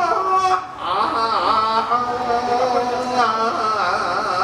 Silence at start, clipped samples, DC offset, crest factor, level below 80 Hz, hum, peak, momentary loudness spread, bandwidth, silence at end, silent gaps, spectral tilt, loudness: 0 s; under 0.1%; under 0.1%; 14 dB; -52 dBFS; none; -6 dBFS; 4 LU; 12.5 kHz; 0 s; none; -3.5 dB/octave; -19 LUFS